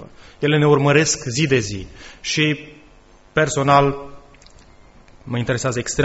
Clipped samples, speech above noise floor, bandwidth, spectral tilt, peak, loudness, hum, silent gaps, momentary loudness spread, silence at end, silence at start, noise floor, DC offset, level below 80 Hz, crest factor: under 0.1%; 30 dB; 8.2 kHz; -4.5 dB/octave; -2 dBFS; -18 LUFS; none; none; 14 LU; 0 s; 0 s; -48 dBFS; under 0.1%; -46 dBFS; 18 dB